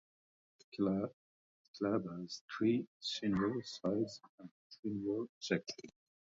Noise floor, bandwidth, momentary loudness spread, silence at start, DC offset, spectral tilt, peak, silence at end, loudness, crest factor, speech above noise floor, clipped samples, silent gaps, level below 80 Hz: under -90 dBFS; 7.6 kHz; 18 LU; 0.75 s; under 0.1%; -5 dB/octave; -20 dBFS; 0.5 s; -39 LUFS; 20 dB; over 52 dB; under 0.1%; 1.13-1.74 s, 2.41-2.48 s, 2.87-3.00 s, 4.29-4.38 s, 4.51-4.70 s, 4.79-4.83 s, 5.29-5.41 s; -70 dBFS